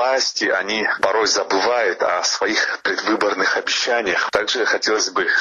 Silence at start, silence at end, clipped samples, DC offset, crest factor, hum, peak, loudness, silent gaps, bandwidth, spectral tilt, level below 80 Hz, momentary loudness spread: 0 s; 0 s; under 0.1%; under 0.1%; 16 dB; none; -2 dBFS; -18 LUFS; none; 11 kHz; -0.5 dB/octave; -60 dBFS; 2 LU